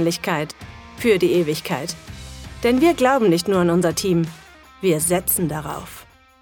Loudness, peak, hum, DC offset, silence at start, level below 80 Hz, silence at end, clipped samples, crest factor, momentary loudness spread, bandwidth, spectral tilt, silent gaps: -19 LUFS; -2 dBFS; none; under 0.1%; 0 s; -46 dBFS; 0.4 s; under 0.1%; 18 dB; 19 LU; 19 kHz; -5 dB/octave; none